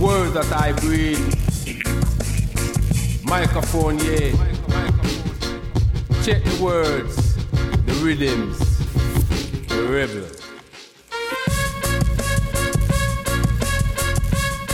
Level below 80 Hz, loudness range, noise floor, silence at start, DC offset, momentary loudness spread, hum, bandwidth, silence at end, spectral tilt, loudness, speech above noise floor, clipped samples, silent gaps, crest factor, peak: -24 dBFS; 3 LU; -44 dBFS; 0 s; under 0.1%; 5 LU; none; 16.5 kHz; 0 s; -5.5 dB/octave; -21 LUFS; 25 dB; under 0.1%; none; 14 dB; -6 dBFS